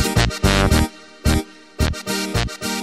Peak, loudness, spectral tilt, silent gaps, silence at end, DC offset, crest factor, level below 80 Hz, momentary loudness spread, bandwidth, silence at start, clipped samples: -4 dBFS; -20 LUFS; -4.5 dB/octave; none; 0 s; under 0.1%; 16 dB; -26 dBFS; 8 LU; 16 kHz; 0 s; under 0.1%